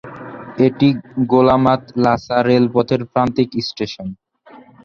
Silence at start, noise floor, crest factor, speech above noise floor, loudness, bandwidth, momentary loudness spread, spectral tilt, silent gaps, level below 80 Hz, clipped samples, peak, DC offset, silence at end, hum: 0.05 s; -44 dBFS; 16 dB; 29 dB; -16 LUFS; 6.8 kHz; 17 LU; -7.5 dB/octave; none; -48 dBFS; under 0.1%; -2 dBFS; under 0.1%; 0.3 s; none